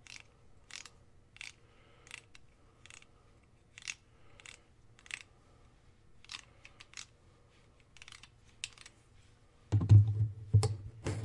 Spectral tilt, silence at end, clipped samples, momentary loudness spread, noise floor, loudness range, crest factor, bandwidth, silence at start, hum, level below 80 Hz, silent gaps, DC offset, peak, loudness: -6 dB/octave; 0 s; under 0.1%; 28 LU; -64 dBFS; 21 LU; 24 dB; 11 kHz; 0.75 s; none; -60 dBFS; none; under 0.1%; -12 dBFS; -32 LUFS